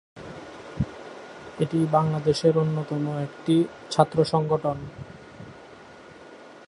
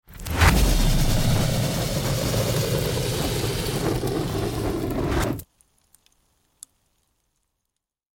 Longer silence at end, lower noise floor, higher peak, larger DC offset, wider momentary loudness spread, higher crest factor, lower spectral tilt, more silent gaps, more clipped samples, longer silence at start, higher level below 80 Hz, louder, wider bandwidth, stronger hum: second, 0.05 s vs 2.75 s; second, -46 dBFS vs -82 dBFS; about the same, -2 dBFS vs -4 dBFS; neither; first, 24 LU vs 7 LU; about the same, 24 dB vs 20 dB; first, -7 dB/octave vs -5 dB/octave; neither; neither; about the same, 0.15 s vs 0.1 s; second, -52 dBFS vs -30 dBFS; about the same, -24 LUFS vs -24 LUFS; second, 11 kHz vs 17 kHz; neither